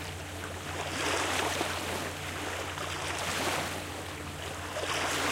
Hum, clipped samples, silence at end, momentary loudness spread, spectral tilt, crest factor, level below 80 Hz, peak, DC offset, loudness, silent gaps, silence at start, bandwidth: none; under 0.1%; 0 s; 9 LU; -2.5 dB/octave; 18 dB; -54 dBFS; -16 dBFS; under 0.1%; -33 LUFS; none; 0 s; 16 kHz